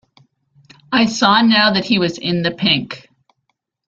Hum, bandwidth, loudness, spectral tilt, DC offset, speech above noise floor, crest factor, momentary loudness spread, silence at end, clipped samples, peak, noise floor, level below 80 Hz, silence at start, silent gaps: none; 7.8 kHz; -15 LUFS; -4.5 dB/octave; under 0.1%; 56 dB; 18 dB; 8 LU; 0.9 s; under 0.1%; 0 dBFS; -71 dBFS; -56 dBFS; 0.9 s; none